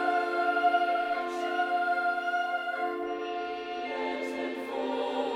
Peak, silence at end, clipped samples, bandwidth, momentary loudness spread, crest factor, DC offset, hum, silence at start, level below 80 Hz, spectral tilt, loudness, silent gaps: -14 dBFS; 0 s; under 0.1%; 13 kHz; 8 LU; 16 dB; under 0.1%; none; 0 s; -74 dBFS; -3 dB/octave; -30 LUFS; none